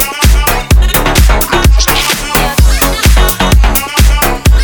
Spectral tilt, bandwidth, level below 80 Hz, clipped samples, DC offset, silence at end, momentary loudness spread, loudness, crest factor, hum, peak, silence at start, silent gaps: -4 dB/octave; over 20 kHz; -10 dBFS; 0.5%; under 0.1%; 0 s; 2 LU; -9 LUFS; 8 dB; none; 0 dBFS; 0 s; none